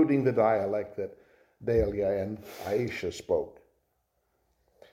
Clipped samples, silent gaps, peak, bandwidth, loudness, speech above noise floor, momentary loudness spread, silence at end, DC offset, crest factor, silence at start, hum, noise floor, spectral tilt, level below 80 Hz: under 0.1%; none; -12 dBFS; 16.5 kHz; -29 LUFS; 47 dB; 14 LU; 1.4 s; under 0.1%; 18 dB; 0 s; none; -76 dBFS; -7 dB/octave; -50 dBFS